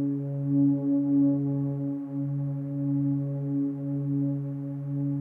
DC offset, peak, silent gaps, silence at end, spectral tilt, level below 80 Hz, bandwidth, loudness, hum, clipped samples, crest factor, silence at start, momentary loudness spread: under 0.1%; -16 dBFS; none; 0 s; -13.5 dB/octave; -72 dBFS; 2 kHz; -28 LUFS; none; under 0.1%; 12 dB; 0 s; 8 LU